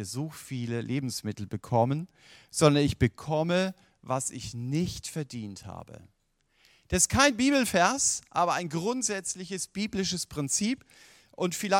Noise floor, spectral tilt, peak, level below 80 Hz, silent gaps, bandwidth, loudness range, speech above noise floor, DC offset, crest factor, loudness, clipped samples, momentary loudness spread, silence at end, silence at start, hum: -69 dBFS; -4 dB/octave; -6 dBFS; -52 dBFS; none; 17 kHz; 7 LU; 41 dB; under 0.1%; 22 dB; -28 LUFS; under 0.1%; 14 LU; 0 s; 0 s; none